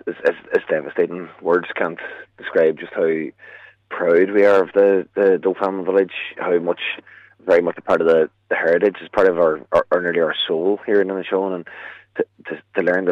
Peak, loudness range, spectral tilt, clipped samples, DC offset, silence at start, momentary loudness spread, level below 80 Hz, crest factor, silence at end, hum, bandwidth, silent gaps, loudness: -4 dBFS; 4 LU; -6.5 dB/octave; under 0.1%; under 0.1%; 0.05 s; 12 LU; -62 dBFS; 14 dB; 0 s; none; 6.4 kHz; none; -19 LUFS